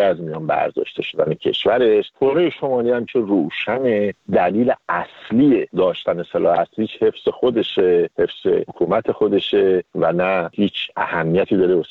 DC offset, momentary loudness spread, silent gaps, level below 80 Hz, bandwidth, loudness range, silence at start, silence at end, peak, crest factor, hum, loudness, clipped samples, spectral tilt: under 0.1%; 5 LU; none; -56 dBFS; 4.7 kHz; 1 LU; 0 s; 0.05 s; -4 dBFS; 14 dB; none; -19 LUFS; under 0.1%; -8 dB/octave